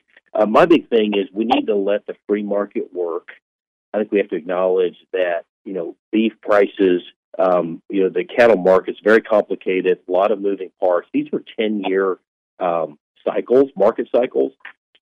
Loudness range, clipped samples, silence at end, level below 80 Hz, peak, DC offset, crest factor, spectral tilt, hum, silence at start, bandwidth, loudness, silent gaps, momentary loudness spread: 5 LU; under 0.1%; 0.3 s; -60 dBFS; -2 dBFS; under 0.1%; 16 dB; -7 dB/octave; none; 0.35 s; 8.2 kHz; -19 LUFS; 3.42-3.59 s, 3.67-3.92 s, 5.49-5.65 s, 5.99-6.12 s, 7.16-7.32 s, 12.27-12.57 s, 13.00-13.15 s; 11 LU